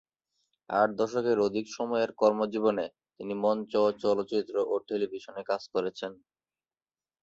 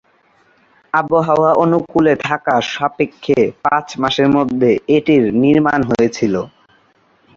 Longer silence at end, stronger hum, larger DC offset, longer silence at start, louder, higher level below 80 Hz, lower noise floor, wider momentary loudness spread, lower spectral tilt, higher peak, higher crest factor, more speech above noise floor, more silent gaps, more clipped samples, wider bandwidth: first, 1.1 s vs 0.9 s; neither; neither; second, 0.7 s vs 0.95 s; second, -29 LUFS vs -15 LUFS; second, -72 dBFS vs -50 dBFS; first, under -90 dBFS vs -55 dBFS; first, 10 LU vs 7 LU; about the same, -5.5 dB/octave vs -6.5 dB/octave; second, -10 dBFS vs 0 dBFS; first, 20 dB vs 14 dB; first, over 61 dB vs 41 dB; neither; neither; about the same, 7.8 kHz vs 7.4 kHz